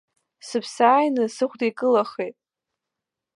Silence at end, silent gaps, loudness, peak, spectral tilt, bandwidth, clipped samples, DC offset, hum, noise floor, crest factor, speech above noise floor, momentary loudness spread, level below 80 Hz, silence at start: 1.05 s; none; -22 LUFS; -4 dBFS; -4.5 dB/octave; 11.5 kHz; under 0.1%; under 0.1%; none; -85 dBFS; 20 dB; 64 dB; 12 LU; -82 dBFS; 0.45 s